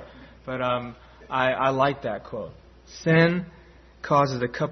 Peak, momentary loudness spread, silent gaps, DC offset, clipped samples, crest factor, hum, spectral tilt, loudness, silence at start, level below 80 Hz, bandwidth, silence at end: -6 dBFS; 21 LU; none; under 0.1%; under 0.1%; 18 dB; none; -6.5 dB/octave; -24 LUFS; 0 s; -54 dBFS; 6.4 kHz; 0 s